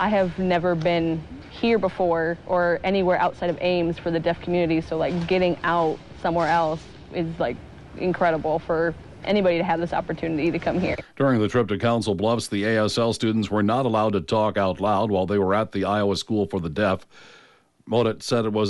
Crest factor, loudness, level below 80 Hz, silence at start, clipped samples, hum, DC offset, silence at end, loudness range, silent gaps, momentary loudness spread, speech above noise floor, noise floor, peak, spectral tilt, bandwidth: 12 dB; -23 LUFS; -48 dBFS; 0 s; under 0.1%; none; under 0.1%; 0 s; 2 LU; none; 6 LU; 30 dB; -52 dBFS; -10 dBFS; -6.5 dB/octave; 11.5 kHz